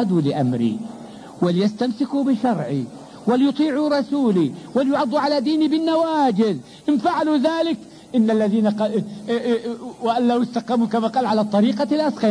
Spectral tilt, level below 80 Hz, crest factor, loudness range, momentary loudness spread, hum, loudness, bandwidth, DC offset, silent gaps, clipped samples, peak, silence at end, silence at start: -7 dB/octave; -64 dBFS; 12 dB; 2 LU; 8 LU; none; -20 LUFS; 10.5 kHz; under 0.1%; none; under 0.1%; -8 dBFS; 0 s; 0 s